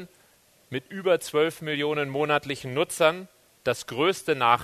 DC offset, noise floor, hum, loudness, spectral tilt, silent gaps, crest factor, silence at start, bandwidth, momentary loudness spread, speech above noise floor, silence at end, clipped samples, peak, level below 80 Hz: under 0.1%; -60 dBFS; none; -26 LUFS; -4 dB/octave; none; 22 dB; 0 s; 13.5 kHz; 10 LU; 35 dB; 0 s; under 0.1%; -4 dBFS; -66 dBFS